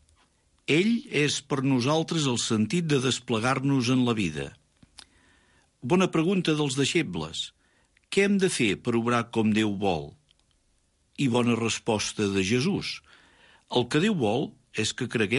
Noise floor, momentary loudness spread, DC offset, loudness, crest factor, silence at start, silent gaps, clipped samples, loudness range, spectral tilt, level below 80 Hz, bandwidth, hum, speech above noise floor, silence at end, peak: -68 dBFS; 8 LU; under 0.1%; -26 LUFS; 16 dB; 0.7 s; none; under 0.1%; 3 LU; -5 dB/octave; -58 dBFS; 11.5 kHz; none; 43 dB; 0 s; -12 dBFS